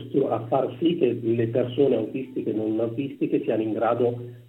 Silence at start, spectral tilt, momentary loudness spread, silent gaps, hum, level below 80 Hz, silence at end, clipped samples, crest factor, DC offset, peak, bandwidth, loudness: 0 s; -9.5 dB/octave; 6 LU; none; none; -68 dBFS; 0.05 s; under 0.1%; 16 dB; under 0.1%; -8 dBFS; 4.1 kHz; -25 LUFS